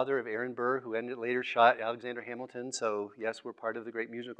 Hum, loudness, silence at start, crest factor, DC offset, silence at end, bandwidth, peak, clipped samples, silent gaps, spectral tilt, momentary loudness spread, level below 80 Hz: none; -33 LUFS; 0 s; 22 dB; under 0.1%; 0.05 s; 9.4 kHz; -10 dBFS; under 0.1%; none; -3.5 dB/octave; 14 LU; under -90 dBFS